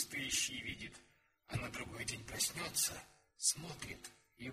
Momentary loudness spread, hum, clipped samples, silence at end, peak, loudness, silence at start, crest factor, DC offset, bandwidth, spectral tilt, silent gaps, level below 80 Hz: 15 LU; none; under 0.1%; 0 s; -20 dBFS; -39 LUFS; 0 s; 24 dB; under 0.1%; 15.5 kHz; -1.5 dB/octave; none; -64 dBFS